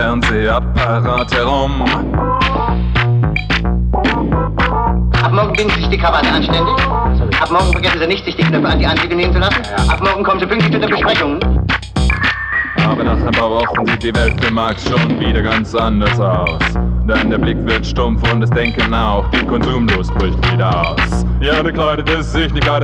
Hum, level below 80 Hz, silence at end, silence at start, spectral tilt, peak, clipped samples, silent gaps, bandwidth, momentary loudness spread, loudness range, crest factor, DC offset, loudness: none; -20 dBFS; 0 s; 0 s; -6.5 dB/octave; -2 dBFS; under 0.1%; none; 9.6 kHz; 3 LU; 1 LU; 12 dB; under 0.1%; -14 LUFS